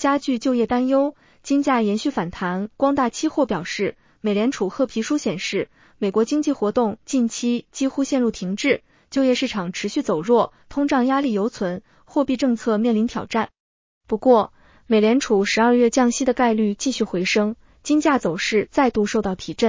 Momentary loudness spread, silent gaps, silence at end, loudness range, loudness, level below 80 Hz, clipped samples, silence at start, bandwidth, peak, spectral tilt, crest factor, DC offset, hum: 8 LU; 13.60-14.01 s; 0 s; 4 LU; -21 LUFS; -54 dBFS; under 0.1%; 0 s; 7.6 kHz; -4 dBFS; -5 dB/octave; 18 dB; under 0.1%; none